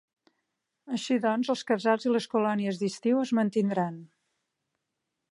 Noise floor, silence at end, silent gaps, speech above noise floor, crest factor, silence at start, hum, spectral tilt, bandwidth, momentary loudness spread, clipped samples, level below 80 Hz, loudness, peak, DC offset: -84 dBFS; 1.25 s; none; 57 dB; 20 dB; 0.85 s; none; -6 dB/octave; 11.5 kHz; 8 LU; under 0.1%; -80 dBFS; -28 LUFS; -10 dBFS; under 0.1%